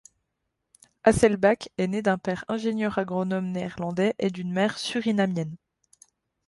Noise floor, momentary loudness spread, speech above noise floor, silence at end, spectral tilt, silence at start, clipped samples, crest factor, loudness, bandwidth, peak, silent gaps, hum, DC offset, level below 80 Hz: -80 dBFS; 9 LU; 55 dB; 0.9 s; -6 dB/octave; 1.05 s; under 0.1%; 22 dB; -25 LUFS; 11.5 kHz; -4 dBFS; none; none; under 0.1%; -54 dBFS